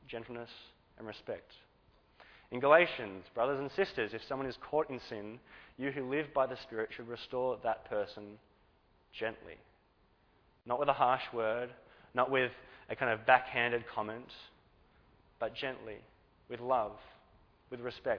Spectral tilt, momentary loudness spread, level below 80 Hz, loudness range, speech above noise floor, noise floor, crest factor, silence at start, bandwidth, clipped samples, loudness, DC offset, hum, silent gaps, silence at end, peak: -2.5 dB/octave; 22 LU; -68 dBFS; 8 LU; 35 dB; -70 dBFS; 28 dB; 0.1 s; 5.4 kHz; under 0.1%; -35 LUFS; under 0.1%; none; none; 0 s; -8 dBFS